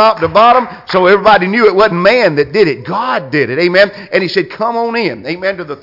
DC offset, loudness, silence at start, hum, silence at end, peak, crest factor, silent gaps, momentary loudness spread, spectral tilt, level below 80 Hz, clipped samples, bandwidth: under 0.1%; -11 LUFS; 0 s; none; 0.05 s; 0 dBFS; 10 dB; none; 9 LU; -6.5 dB/octave; -48 dBFS; under 0.1%; 5.8 kHz